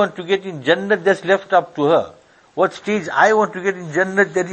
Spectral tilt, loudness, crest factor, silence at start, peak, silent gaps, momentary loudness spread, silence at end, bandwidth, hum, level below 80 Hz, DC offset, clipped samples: -5 dB/octave; -18 LUFS; 18 dB; 0 s; 0 dBFS; none; 7 LU; 0 s; 8.8 kHz; none; -62 dBFS; under 0.1%; under 0.1%